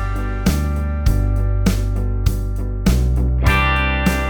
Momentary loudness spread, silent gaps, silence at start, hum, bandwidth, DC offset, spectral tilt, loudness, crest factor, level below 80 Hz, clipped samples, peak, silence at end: 6 LU; none; 0 s; none; over 20 kHz; under 0.1%; -6 dB/octave; -19 LUFS; 16 dB; -20 dBFS; under 0.1%; -2 dBFS; 0 s